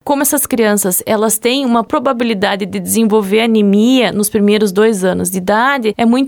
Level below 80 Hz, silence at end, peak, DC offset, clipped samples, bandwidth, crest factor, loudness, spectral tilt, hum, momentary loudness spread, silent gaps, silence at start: -52 dBFS; 0 s; -2 dBFS; under 0.1%; under 0.1%; over 20 kHz; 10 dB; -12 LUFS; -4 dB/octave; none; 4 LU; none; 0.05 s